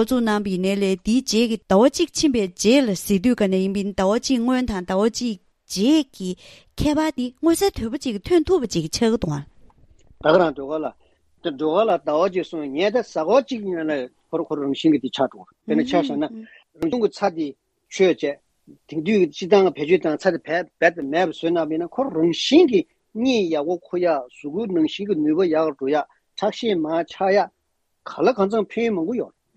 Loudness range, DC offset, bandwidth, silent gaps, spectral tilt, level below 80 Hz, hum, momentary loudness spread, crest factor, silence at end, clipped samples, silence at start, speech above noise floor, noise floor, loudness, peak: 4 LU; under 0.1%; 14 kHz; none; -5 dB/octave; -48 dBFS; none; 11 LU; 18 dB; 0.3 s; under 0.1%; 0 s; 49 dB; -69 dBFS; -21 LUFS; -2 dBFS